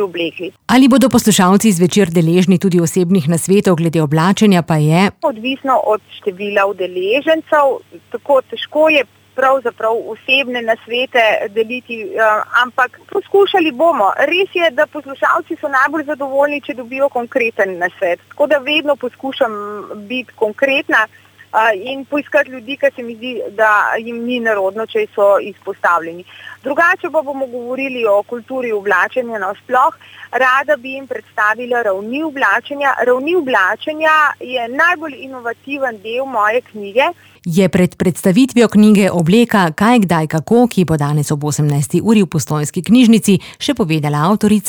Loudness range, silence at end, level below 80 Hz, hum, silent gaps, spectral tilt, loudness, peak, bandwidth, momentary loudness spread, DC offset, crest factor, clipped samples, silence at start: 5 LU; 0 s; -52 dBFS; none; none; -5.5 dB/octave; -14 LUFS; -2 dBFS; over 20 kHz; 11 LU; under 0.1%; 12 dB; under 0.1%; 0 s